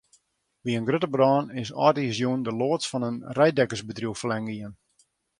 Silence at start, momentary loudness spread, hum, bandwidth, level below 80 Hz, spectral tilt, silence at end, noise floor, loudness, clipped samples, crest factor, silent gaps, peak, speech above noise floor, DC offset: 0.65 s; 11 LU; none; 11.5 kHz; -64 dBFS; -5.5 dB/octave; 0.65 s; -67 dBFS; -25 LUFS; under 0.1%; 22 dB; none; -4 dBFS; 42 dB; under 0.1%